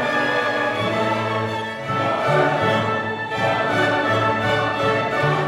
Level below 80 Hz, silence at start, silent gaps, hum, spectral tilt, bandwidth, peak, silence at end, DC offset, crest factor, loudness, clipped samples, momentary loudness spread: -54 dBFS; 0 s; none; none; -5.5 dB/octave; 15.5 kHz; -6 dBFS; 0 s; under 0.1%; 14 dB; -20 LUFS; under 0.1%; 5 LU